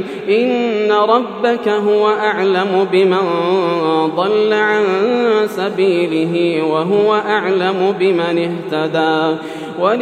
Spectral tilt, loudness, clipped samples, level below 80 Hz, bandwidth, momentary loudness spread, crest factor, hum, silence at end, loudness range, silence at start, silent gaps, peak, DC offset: -6.5 dB/octave; -15 LUFS; under 0.1%; -70 dBFS; 10 kHz; 4 LU; 14 dB; none; 0 s; 1 LU; 0 s; none; 0 dBFS; under 0.1%